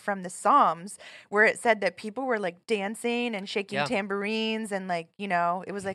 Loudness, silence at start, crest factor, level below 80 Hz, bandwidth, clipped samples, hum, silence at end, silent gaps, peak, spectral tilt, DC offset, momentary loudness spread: -27 LUFS; 0.05 s; 18 dB; -78 dBFS; 13 kHz; under 0.1%; none; 0 s; none; -8 dBFS; -4 dB/octave; under 0.1%; 11 LU